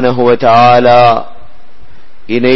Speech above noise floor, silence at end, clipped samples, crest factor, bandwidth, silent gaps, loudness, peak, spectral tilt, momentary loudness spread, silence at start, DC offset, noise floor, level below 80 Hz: 36 dB; 0 s; 0.4%; 10 dB; 6.2 kHz; none; -7 LUFS; 0 dBFS; -7 dB/octave; 10 LU; 0 s; 10%; -42 dBFS; -42 dBFS